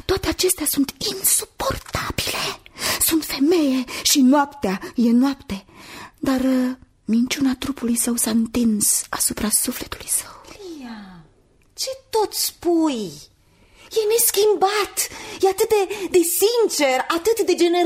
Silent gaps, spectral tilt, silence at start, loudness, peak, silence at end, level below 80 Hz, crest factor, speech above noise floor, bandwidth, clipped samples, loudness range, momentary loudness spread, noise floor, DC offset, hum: none; -2.5 dB/octave; 0.1 s; -20 LUFS; -4 dBFS; 0 s; -46 dBFS; 18 dB; 36 dB; 16 kHz; under 0.1%; 5 LU; 13 LU; -56 dBFS; under 0.1%; none